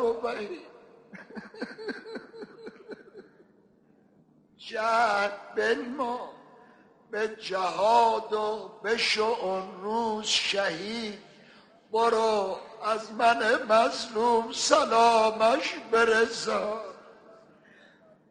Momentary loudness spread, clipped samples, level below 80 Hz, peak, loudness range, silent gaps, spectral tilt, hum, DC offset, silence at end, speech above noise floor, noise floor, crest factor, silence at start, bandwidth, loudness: 22 LU; under 0.1%; -68 dBFS; -6 dBFS; 17 LU; none; -2 dB/octave; none; under 0.1%; 1 s; 35 dB; -62 dBFS; 22 dB; 0 s; 10.5 kHz; -26 LUFS